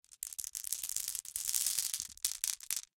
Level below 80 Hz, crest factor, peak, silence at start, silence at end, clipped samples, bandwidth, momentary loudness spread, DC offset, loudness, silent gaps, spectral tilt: -72 dBFS; 30 dB; -8 dBFS; 0.1 s; 0.2 s; under 0.1%; 17 kHz; 8 LU; under 0.1%; -35 LUFS; none; 3.5 dB/octave